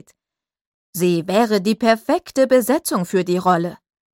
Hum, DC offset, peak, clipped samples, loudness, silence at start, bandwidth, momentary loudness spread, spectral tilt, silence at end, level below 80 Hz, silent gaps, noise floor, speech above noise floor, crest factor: none; under 0.1%; -2 dBFS; under 0.1%; -18 LUFS; 0.95 s; 16.5 kHz; 5 LU; -5.5 dB/octave; 0.4 s; -62 dBFS; none; -88 dBFS; 71 dB; 16 dB